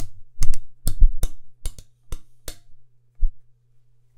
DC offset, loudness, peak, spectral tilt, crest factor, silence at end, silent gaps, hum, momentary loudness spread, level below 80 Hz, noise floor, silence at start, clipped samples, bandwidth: under 0.1%; -31 LUFS; 0 dBFS; -4.5 dB/octave; 18 dB; 0.8 s; none; none; 17 LU; -24 dBFS; -53 dBFS; 0 s; under 0.1%; 13 kHz